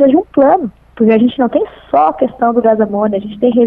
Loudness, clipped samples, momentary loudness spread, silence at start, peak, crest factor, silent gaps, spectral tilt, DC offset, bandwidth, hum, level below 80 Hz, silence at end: -12 LUFS; under 0.1%; 5 LU; 0 s; 0 dBFS; 12 dB; none; -10 dB/octave; under 0.1%; 3.9 kHz; none; -48 dBFS; 0 s